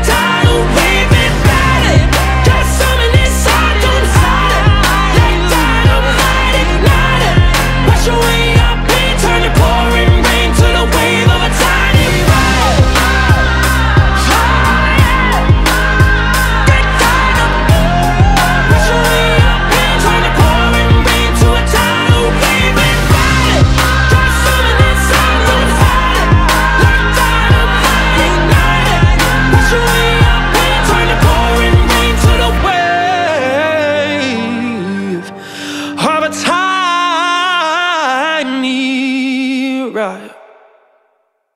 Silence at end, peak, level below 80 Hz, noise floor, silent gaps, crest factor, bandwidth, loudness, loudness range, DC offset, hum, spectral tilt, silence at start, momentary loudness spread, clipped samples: 1.25 s; 0 dBFS; -14 dBFS; -60 dBFS; none; 10 dB; 16.5 kHz; -10 LUFS; 4 LU; under 0.1%; none; -4.5 dB/octave; 0 s; 4 LU; under 0.1%